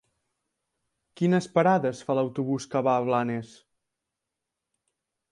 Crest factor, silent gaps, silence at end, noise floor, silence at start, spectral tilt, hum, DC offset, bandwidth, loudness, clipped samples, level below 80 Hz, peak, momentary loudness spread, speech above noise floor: 20 dB; none; 1.85 s; -86 dBFS; 1.2 s; -7 dB/octave; none; under 0.1%; 11 kHz; -26 LUFS; under 0.1%; -70 dBFS; -8 dBFS; 7 LU; 61 dB